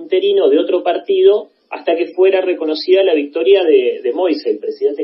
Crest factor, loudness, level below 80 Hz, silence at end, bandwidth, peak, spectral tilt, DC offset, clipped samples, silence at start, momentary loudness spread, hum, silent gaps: 14 dB; -14 LUFS; -74 dBFS; 0 s; 5.8 kHz; 0 dBFS; -7 dB/octave; under 0.1%; under 0.1%; 0 s; 7 LU; none; none